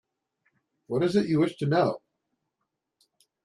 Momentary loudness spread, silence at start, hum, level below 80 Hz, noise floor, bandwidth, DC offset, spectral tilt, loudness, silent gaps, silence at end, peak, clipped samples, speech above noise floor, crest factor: 7 LU; 0.9 s; none; -68 dBFS; -82 dBFS; 11.5 kHz; under 0.1%; -7.5 dB/octave; -26 LUFS; none; 1.45 s; -12 dBFS; under 0.1%; 58 dB; 18 dB